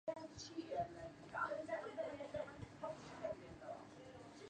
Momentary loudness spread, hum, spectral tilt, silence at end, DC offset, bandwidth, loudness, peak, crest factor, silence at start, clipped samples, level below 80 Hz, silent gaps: 11 LU; none; -5 dB/octave; 0 s; under 0.1%; 9.8 kHz; -49 LUFS; -30 dBFS; 18 dB; 0.05 s; under 0.1%; -72 dBFS; none